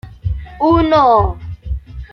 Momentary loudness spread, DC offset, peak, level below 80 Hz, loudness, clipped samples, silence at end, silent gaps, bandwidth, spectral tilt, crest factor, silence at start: 17 LU; under 0.1%; 0 dBFS; -28 dBFS; -14 LUFS; under 0.1%; 0.05 s; none; 6.2 kHz; -8.5 dB/octave; 14 dB; 0.05 s